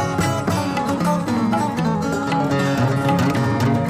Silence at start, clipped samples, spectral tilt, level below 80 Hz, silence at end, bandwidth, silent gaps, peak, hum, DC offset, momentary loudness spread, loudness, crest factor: 0 s; under 0.1%; -6.5 dB/octave; -46 dBFS; 0 s; 15.5 kHz; none; -8 dBFS; none; under 0.1%; 3 LU; -20 LUFS; 12 dB